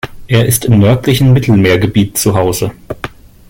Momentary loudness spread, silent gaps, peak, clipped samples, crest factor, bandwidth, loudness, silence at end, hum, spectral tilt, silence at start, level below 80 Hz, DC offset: 16 LU; none; 0 dBFS; under 0.1%; 10 dB; 17 kHz; -10 LUFS; 0.4 s; none; -5.5 dB/octave; 0.05 s; -34 dBFS; under 0.1%